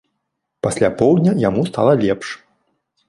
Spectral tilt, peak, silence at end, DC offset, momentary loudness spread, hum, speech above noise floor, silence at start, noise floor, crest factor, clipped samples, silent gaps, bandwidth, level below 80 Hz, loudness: -7 dB/octave; -2 dBFS; 0.7 s; under 0.1%; 10 LU; none; 60 dB; 0.65 s; -75 dBFS; 16 dB; under 0.1%; none; 11.5 kHz; -50 dBFS; -17 LUFS